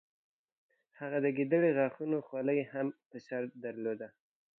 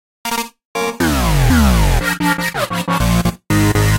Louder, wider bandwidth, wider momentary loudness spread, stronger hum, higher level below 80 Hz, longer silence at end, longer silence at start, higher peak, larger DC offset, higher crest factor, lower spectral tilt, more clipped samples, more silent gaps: second, -34 LUFS vs -16 LUFS; second, 6.2 kHz vs 17 kHz; first, 14 LU vs 9 LU; neither; second, -90 dBFS vs -20 dBFS; first, 0.5 s vs 0 s; first, 1 s vs 0.25 s; second, -18 dBFS vs 0 dBFS; neither; about the same, 18 dB vs 14 dB; first, -9.5 dB/octave vs -5 dB/octave; neither; second, 3.06-3.10 s vs 0.65-0.75 s